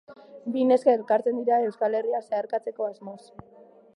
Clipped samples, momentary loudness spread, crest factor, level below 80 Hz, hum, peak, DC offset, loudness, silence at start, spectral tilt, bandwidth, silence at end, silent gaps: under 0.1%; 18 LU; 20 dB; -72 dBFS; none; -6 dBFS; under 0.1%; -25 LUFS; 0.1 s; -6.5 dB/octave; 10.5 kHz; 0.8 s; none